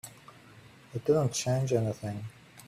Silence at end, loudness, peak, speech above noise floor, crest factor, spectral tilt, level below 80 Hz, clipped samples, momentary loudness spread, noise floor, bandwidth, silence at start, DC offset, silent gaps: 0.05 s; -30 LUFS; -14 dBFS; 25 dB; 18 dB; -5.5 dB/octave; -64 dBFS; under 0.1%; 16 LU; -54 dBFS; 15 kHz; 0.05 s; under 0.1%; none